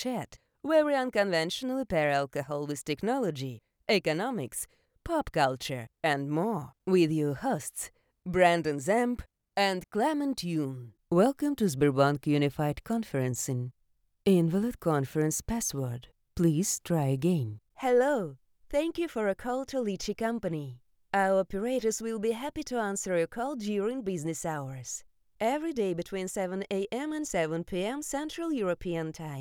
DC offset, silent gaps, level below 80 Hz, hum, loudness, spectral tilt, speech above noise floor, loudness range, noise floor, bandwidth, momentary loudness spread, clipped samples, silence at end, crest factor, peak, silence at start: under 0.1%; none; -56 dBFS; none; -30 LUFS; -5 dB/octave; 42 dB; 4 LU; -71 dBFS; over 20 kHz; 11 LU; under 0.1%; 0 s; 20 dB; -10 dBFS; 0 s